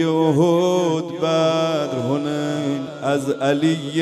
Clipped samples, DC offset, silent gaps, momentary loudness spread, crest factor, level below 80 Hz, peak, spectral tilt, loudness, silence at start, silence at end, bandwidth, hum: under 0.1%; under 0.1%; none; 6 LU; 14 dB; -68 dBFS; -6 dBFS; -6 dB/octave; -20 LUFS; 0 s; 0 s; 13 kHz; none